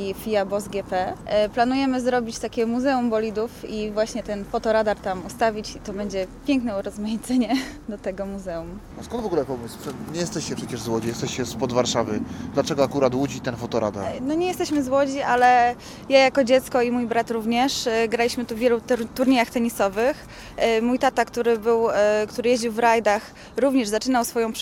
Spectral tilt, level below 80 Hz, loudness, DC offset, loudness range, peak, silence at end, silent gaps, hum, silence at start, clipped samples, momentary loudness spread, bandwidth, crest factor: -4.5 dB/octave; -48 dBFS; -23 LUFS; under 0.1%; 7 LU; -2 dBFS; 0 s; none; none; 0 s; under 0.1%; 11 LU; 17 kHz; 20 dB